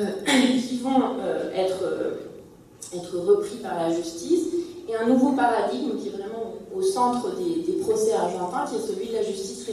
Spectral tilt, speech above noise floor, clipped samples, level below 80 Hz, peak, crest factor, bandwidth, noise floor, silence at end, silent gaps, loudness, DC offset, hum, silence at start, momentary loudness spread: -4.5 dB/octave; 22 dB; under 0.1%; -64 dBFS; -8 dBFS; 18 dB; 14.5 kHz; -46 dBFS; 0 s; none; -25 LUFS; under 0.1%; none; 0 s; 12 LU